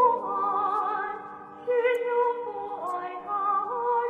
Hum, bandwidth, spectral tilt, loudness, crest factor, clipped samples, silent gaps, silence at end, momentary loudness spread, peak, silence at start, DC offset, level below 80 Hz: none; 8.6 kHz; -5 dB/octave; -28 LUFS; 16 dB; under 0.1%; none; 0 s; 9 LU; -10 dBFS; 0 s; under 0.1%; -72 dBFS